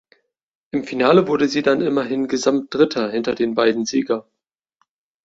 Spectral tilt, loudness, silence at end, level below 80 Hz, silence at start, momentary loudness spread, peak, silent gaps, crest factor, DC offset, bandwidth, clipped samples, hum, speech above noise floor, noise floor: -5 dB/octave; -19 LUFS; 1.05 s; -62 dBFS; 0.75 s; 10 LU; -2 dBFS; none; 18 dB; under 0.1%; 8 kHz; under 0.1%; none; 50 dB; -68 dBFS